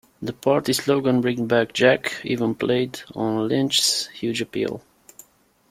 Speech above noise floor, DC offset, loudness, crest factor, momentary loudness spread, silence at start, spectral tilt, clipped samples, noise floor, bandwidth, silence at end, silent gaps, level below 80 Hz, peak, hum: 33 dB; under 0.1%; -22 LUFS; 20 dB; 9 LU; 0.2 s; -4 dB/octave; under 0.1%; -55 dBFS; 16 kHz; 0.9 s; none; -60 dBFS; -4 dBFS; none